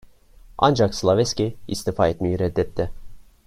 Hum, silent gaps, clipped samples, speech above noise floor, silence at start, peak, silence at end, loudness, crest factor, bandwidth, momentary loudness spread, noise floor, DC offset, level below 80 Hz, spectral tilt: none; none; under 0.1%; 27 dB; 0.5 s; -2 dBFS; 0.25 s; -22 LUFS; 20 dB; 15.5 kHz; 10 LU; -48 dBFS; under 0.1%; -42 dBFS; -5.5 dB/octave